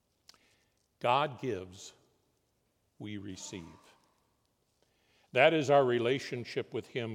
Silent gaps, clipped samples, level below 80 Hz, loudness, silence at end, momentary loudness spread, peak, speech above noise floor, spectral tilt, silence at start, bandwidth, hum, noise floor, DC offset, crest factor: none; under 0.1%; -80 dBFS; -31 LUFS; 0 s; 22 LU; -10 dBFS; 45 dB; -5 dB/octave; 1.05 s; 13 kHz; none; -77 dBFS; under 0.1%; 24 dB